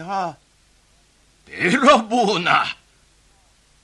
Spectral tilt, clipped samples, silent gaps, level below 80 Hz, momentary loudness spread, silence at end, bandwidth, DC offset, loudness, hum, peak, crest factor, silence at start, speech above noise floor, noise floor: -4 dB/octave; under 0.1%; none; -58 dBFS; 18 LU; 1.1 s; 11.5 kHz; under 0.1%; -18 LUFS; none; 0 dBFS; 22 dB; 0 s; 39 dB; -57 dBFS